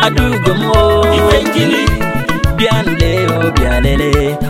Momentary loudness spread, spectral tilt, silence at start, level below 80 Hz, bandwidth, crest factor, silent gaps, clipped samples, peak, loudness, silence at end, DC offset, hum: 4 LU; -5.5 dB/octave; 0 s; -20 dBFS; 16.5 kHz; 12 dB; none; under 0.1%; 0 dBFS; -12 LUFS; 0 s; under 0.1%; none